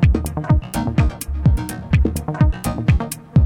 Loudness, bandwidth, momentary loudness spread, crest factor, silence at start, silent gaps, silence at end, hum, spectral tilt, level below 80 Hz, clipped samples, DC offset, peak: -19 LUFS; 19 kHz; 3 LU; 16 dB; 0 s; none; 0 s; none; -7 dB/octave; -22 dBFS; under 0.1%; under 0.1%; -2 dBFS